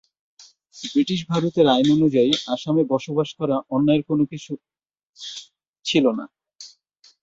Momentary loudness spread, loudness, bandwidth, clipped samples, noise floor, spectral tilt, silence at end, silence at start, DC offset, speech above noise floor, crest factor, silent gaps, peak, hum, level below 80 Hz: 20 LU; -21 LUFS; 8 kHz; under 0.1%; -57 dBFS; -6 dB/octave; 0.55 s; 0.75 s; under 0.1%; 37 dB; 18 dB; 5.03-5.13 s, 5.68-5.74 s; -4 dBFS; none; -60 dBFS